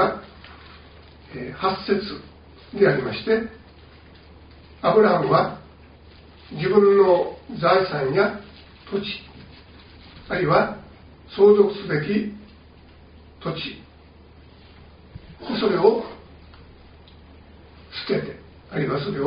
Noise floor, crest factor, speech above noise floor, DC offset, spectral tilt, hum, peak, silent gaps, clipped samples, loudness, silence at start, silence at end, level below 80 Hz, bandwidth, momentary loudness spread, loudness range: -48 dBFS; 20 dB; 28 dB; under 0.1%; -4.5 dB/octave; none; -2 dBFS; none; under 0.1%; -21 LUFS; 0 s; 0 s; -52 dBFS; 5.2 kHz; 22 LU; 7 LU